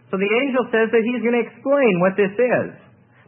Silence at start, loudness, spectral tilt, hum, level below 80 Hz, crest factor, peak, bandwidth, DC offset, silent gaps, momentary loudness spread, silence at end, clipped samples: 0.1 s; -19 LUFS; -11.5 dB/octave; none; -68 dBFS; 14 dB; -4 dBFS; 3.5 kHz; under 0.1%; none; 4 LU; 0.55 s; under 0.1%